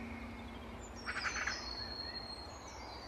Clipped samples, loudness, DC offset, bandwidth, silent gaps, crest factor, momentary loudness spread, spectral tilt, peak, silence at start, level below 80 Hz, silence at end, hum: under 0.1%; -42 LUFS; under 0.1%; 13 kHz; none; 18 dB; 11 LU; -2.5 dB/octave; -26 dBFS; 0 s; -54 dBFS; 0 s; none